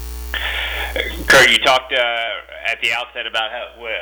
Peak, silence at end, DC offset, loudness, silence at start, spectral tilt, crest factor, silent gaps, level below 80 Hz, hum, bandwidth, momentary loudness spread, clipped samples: -6 dBFS; 0 s; under 0.1%; -16 LUFS; 0 s; -2 dB/octave; 12 dB; none; -34 dBFS; none; over 20 kHz; 15 LU; under 0.1%